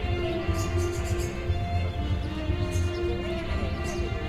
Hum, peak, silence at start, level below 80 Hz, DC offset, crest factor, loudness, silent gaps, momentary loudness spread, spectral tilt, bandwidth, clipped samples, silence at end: none; -14 dBFS; 0 s; -34 dBFS; under 0.1%; 12 dB; -29 LUFS; none; 2 LU; -6 dB/octave; 14 kHz; under 0.1%; 0 s